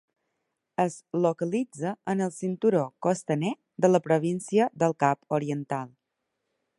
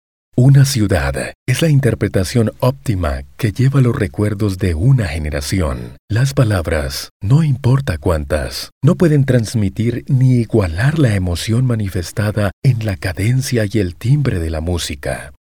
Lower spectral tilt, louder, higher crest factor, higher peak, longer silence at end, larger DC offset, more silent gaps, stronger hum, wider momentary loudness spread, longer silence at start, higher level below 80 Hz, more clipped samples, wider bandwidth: about the same, -6.5 dB/octave vs -6.5 dB/octave; second, -27 LUFS vs -16 LUFS; first, 20 dB vs 14 dB; second, -6 dBFS vs -2 dBFS; first, 0.9 s vs 0.15 s; second, under 0.1% vs 0.7%; second, none vs 1.35-1.46 s, 5.99-6.08 s, 7.11-7.20 s, 8.72-8.81 s, 12.53-12.62 s; neither; about the same, 9 LU vs 8 LU; first, 0.8 s vs 0.35 s; second, -72 dBFS vs -30 dBFS; neither; second, 11.5 kHz vs 17.5 kHz